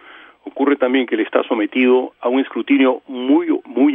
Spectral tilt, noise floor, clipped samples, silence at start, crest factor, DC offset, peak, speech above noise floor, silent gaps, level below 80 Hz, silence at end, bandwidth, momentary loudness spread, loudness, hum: -8 dB/octave; -37 dBFS; under 0.1%; 0.15 s; 16 dB; under 0.1%; -2 dBFS; 21 dB; none; -70 dBFS; 0 s; 3.8 kHz; 6 LU; -17 LUFS; none